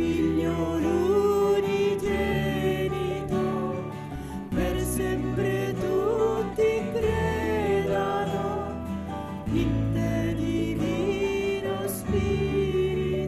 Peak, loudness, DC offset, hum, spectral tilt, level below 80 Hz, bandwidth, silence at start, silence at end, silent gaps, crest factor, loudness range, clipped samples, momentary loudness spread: -12 dBFS; -26 LUFS; under 0.1%; none; -6.5 dB/octave; -40 dBFS; 14 kHz; 0 s; 0 s; none; 14 dB; 3 LU; under 0.1%; 8 LU